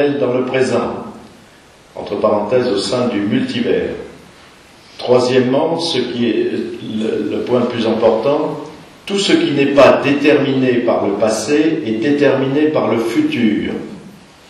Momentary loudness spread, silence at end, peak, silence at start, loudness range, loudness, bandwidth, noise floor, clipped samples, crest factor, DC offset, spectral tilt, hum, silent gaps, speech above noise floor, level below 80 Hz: 12 LU; 0.4 s; 0 dBFS; 0 s; 5 LU; -15 LUFS; 12.5 kHz; -44 dBFS; under 0.1%; 14 dB; under 0.1%; -5.5 dB/octave; none; none; 30 dB; -52 dBFS